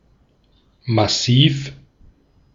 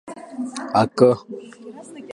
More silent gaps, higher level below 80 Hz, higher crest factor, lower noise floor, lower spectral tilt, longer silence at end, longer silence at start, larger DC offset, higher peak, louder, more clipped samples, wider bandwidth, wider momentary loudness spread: neither; first, -50 dBFS vs -60 dBFS; about the same, 20 dB vs 22 dB; first, -57 dBFS vs -38 dBFS; second, -5 dB/octave vs -6.5 dB/octave; first, 0.8 s vs 0.05 s; first, 0.85 s vs 0.05 s; neither; about the same, -2 dBFS vs 0 dBFS; first, -17 LUFS vs -20 LUFS; neither; second, 7.6 kHz vs 11 kHz; second, 19 LU vs 23 LU